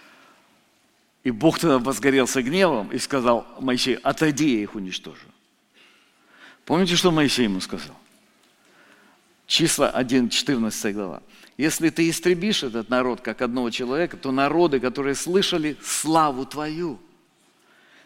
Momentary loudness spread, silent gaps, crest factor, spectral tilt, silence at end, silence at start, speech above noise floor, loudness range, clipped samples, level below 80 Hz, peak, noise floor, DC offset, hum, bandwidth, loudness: 11 LU; none; 20 dB; -4 dB/octave; 1.05 s; 1.25 s; 41 dB; 3 LU; under 0.1%; -52 dBFS; -4 dBFS; -63 dBFS; under 0.1%; none; 16.5 kHz; -22 LUFS